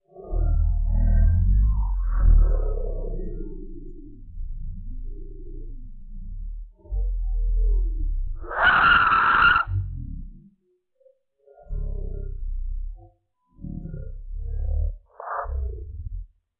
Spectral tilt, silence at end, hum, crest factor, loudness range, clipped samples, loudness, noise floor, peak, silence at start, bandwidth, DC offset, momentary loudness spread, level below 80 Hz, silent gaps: -9 dB/octave; 0.35 s; none; 18 dB; 18 LU; under 0.1%; -24 LUFS; -67 dBFS; -6 dBFS; 0.15 s; 4.4 kHz; under 0.1%; 25 LU; -26 dBFS; none